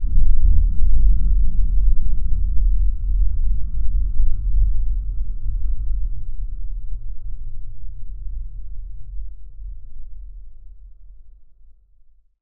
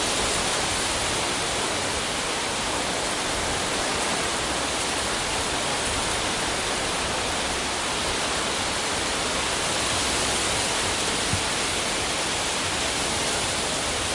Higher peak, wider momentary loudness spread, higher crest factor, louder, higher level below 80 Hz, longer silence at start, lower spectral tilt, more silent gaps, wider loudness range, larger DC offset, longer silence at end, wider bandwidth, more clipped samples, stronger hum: first, -2 dBFS vs -12 dBFS; first, 19 LU vs 2 LU; about the same, 12 dB vs 14 dB; about the same, -25 LUFS vs -24 LUFS; first, -20 dBFS vs -42 dBFS; about the same, 0 s vs 0 s; first, -14.5 dB/octave vs -1.5 dB/octave; neither; first, 18 LU vs 1 LU; neither; first, 1.15 s vs 0 s; second, 0.4 kHz vs 11.5 kHz; neither; neither